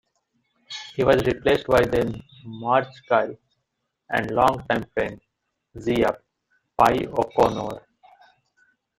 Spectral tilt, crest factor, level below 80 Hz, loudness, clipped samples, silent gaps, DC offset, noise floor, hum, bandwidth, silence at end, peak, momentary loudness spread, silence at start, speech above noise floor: -6 dB/octave; 22 dB; -48 dBFS; -23 LUFS; under 0.1%; none; under 0.1%; -78 dBFS; none; 16 kHz; 1.2 s; -2 dBFS; 16 LU; 0.7 s; 56 dB